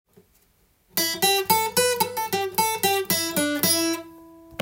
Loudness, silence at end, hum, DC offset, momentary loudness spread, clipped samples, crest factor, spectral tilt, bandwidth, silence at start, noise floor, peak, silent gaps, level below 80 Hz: -22 LUFS; 0 s; none; under 0.1%; 7 LU; under 0.1%; 22 dB; -2 dB/octave; 17 kHz; 0.95 s; -63 dBFS; -2 dBFS; none; -64 dBFS